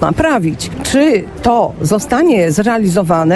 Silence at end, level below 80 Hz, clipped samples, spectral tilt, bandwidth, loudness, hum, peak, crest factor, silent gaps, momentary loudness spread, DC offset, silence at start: 0 s; -36 dBFS; under 0.1%; -5.5 dB/octave; 11 kHz; -13 LUFS; none; 0 dBFS; 12 dB; none; 4 LU; under 0.1%; 0 s